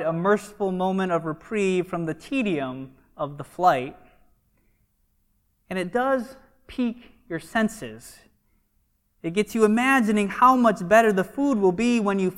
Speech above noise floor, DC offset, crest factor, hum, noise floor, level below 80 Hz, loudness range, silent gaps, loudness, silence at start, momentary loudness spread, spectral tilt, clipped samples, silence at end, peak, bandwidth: 46 dB; under 0.1%; 20 dB; none; -68 dBFS; -58 dBFS; 10 LU; none; -23 LUFS; 0 s; 17 LU; -6 dB/octave; under 0.1%; 0 s; -4 dBFS; 16 kHz